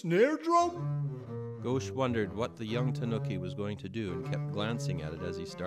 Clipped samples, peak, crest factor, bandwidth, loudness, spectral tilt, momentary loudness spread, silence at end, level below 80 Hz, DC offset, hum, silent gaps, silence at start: under 0.1%; -14 dBFS; 18 dB; 11 kHz; -33 LUFS; -6.5 dB/octave; 11 LU; 0 s; -62 dBFS; under 0.1%; none; none; 0.05 s